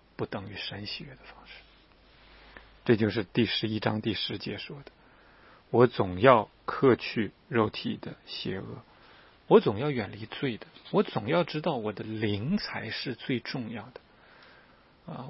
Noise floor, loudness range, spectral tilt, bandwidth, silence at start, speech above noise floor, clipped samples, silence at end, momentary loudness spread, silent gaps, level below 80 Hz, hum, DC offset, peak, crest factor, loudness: -59 dBFS; 7 LU; -9.5 dB/octave; 5.8 kHz; 0.2 s; 30 dB; under 0.1%; 0 s; 19 LU; none; -62 dBFS; none; under 0.1%; -2 dBFS; 28 dB; -29 LUFS